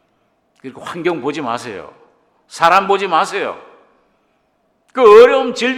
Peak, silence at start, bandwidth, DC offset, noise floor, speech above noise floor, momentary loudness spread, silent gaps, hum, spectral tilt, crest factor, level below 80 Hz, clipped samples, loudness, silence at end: 0 dBFS; 0.65 s; 12 kHz; under 0.1%; -62 dBFS; 49 dB; 25 LU; none; none; -4 dB/octave; 16 dB; -58 dBFS; 0.9%; -13 LUFS; 0 s